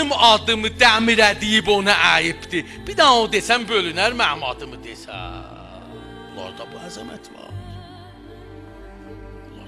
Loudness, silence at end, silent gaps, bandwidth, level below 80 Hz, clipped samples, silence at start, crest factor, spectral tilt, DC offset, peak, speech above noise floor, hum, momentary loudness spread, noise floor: -16 LUFS; 0 s; none; 14.5 kHz; -44 dBFS; under 0.1%; 0 s; 20 dB; -2.5 dB/octave; under 0.1%; 0 dBFS; 21 dB; none; 25 LU; -40 dBFS